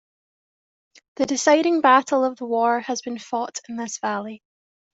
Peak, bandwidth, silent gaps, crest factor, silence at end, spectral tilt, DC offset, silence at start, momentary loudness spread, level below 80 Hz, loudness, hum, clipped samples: -4 dBFS; 8.2 kHz; none; 18 dB; 0.65 s; -2.5 dB/octave; under 0.1%; 1.2 s; 14 LU; -72 dBFS; -21 LUFS; none; under 0.1%